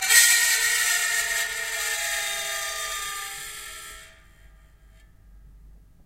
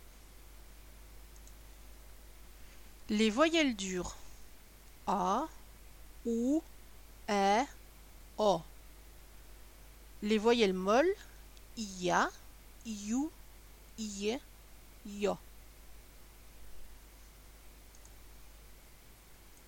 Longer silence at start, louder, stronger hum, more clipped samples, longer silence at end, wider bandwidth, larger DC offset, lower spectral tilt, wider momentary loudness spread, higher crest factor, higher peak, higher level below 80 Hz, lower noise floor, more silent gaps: about the same, 0 s vs 0.05 s; first, -22 LUFS vs -33 LUFS; neither; neither; first, 0.35 s vs 0.15 s; about the same, 16 kHz vs 17 kHz; neither; second, 3 dB/octave vs -4 dB/octave; second, 19 LU vs 27 LU; about the same, 24 dB vs 22 dB; first, -2 dBFS vs -14 dBFS; about the same, -54 dBFS vs -56 dBFS; second, -52 dBFS vs -56 dBFS; neither